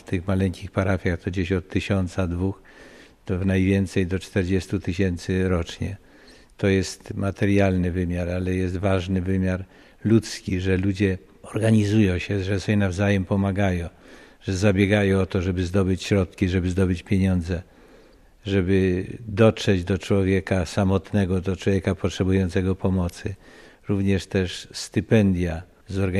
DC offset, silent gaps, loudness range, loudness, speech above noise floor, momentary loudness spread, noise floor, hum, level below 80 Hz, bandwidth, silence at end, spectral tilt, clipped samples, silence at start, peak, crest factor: under 0.1%; none; 3 LU; -23 LUFS; 30 dB; 10 LU; -52 dBFS; none; -44 dBFS; 12 kHz; 0 s; -7 dB/octave; under 0.1%; 0.1 s; -4 dBFS; 18 dB